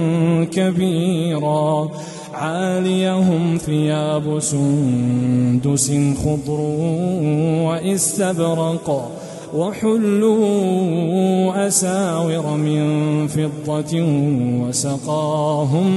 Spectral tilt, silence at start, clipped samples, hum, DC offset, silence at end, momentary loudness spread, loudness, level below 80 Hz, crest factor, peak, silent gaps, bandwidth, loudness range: -6 dB/octave; 0 s; under 0.1%; none; under 0.1%; 0 s; 5 LU; -18 LUFS; -50 dBFS; 14 dB; -4 dBFS; none; 12.5 kHz; 2 LU